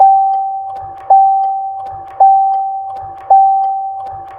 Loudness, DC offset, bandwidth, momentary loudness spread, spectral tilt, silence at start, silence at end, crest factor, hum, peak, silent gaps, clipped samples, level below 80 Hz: -12 LUFS; under 0.1%; 2.4 kHz; 16 LU; -6.5 dB/octave; 0 s; 0 s; 12 dB; none; 0 dBFS; none; under 0.1%; -54 dBFS